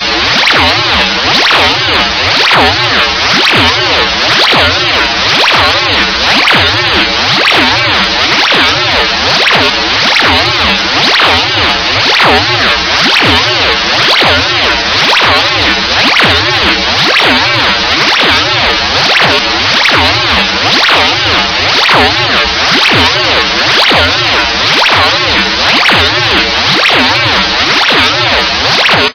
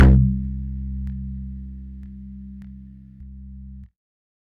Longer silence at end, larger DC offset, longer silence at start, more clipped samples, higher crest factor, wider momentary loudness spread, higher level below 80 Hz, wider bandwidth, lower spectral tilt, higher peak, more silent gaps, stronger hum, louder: second, 0 s vs 0.7 s; first, 0.4% vs under 0.1%; about the same, 0 s vs 0 s; first, 2% vs under 0.1%; second, 8 dB vs 18 dB; second, 2 LU vs 21 LU; about the same, -30 dBFS vs -26 dBFS; first, 5.4 kHz vs 3.4 kHz; second, -2.5 dB/octave vs -10.5 dB/octave; first, 0 dBFS vs -4 dBFS; neither; neither; first, -6 LUFS vs -24 LUFS